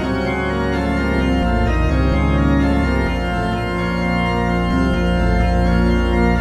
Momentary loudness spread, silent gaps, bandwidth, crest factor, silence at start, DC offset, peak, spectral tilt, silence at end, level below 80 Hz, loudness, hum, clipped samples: 4 LU; none; 11 kHz; 12 dB; 0 s; under 0.1%; -4 dBFS; -7.5 dB/octave; 0 s; -22 dBFS; -18 LUFS; none; under 0.1%